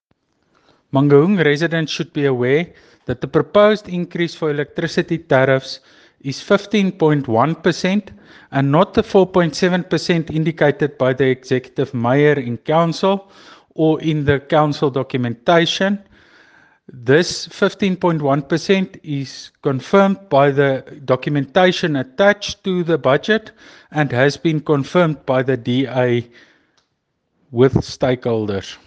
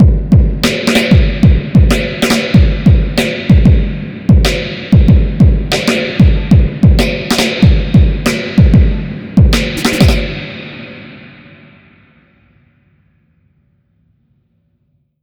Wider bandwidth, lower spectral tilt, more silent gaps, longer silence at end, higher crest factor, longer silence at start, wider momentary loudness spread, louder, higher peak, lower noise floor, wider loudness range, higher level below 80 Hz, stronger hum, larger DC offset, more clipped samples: second, 9.2 kHz vs 18.5 kHz; about the same, -6.5 dB/octave vs -6 dB/octave; neither; second, 0.1 s vs 3.95 s; first, 18 dB vs 10 dB; first, 0.95 s vs 0 s; about the same, 8 LU vs 10 LU; second, -17 LUFS vs -11 LUFS; about the same, 0 dBFS vs 0 dBFS; first, -70 dBFS vs -60 dBFS; second, 2 LU vs 5 LU; second, -52 dBFS vs -16 dBFS; neither; neither; second, under 0.1% vs 1%